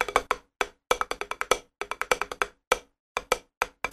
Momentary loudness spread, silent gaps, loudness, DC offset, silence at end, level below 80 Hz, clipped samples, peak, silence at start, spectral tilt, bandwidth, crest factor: 6 LU; 2.67-2.71 s, 3.00-3.15 s, 3.57-3.61 s; -29 LUFS; under 0.1%; 0 s; -52 dBFS; under 0.1%; -4 dBFS; 0 s; -1 dB/octave; 13.5 kHz; 26 dB